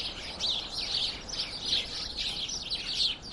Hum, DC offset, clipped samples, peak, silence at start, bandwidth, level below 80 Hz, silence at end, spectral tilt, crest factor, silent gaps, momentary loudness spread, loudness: none; under 0.1%; under 0.1%; -16 dBFS; 0 s; 11.5 kHz; -50 dBFS; 0 s; -1 dB/octave; 18 dB; none; 6 LU; -30 LUFS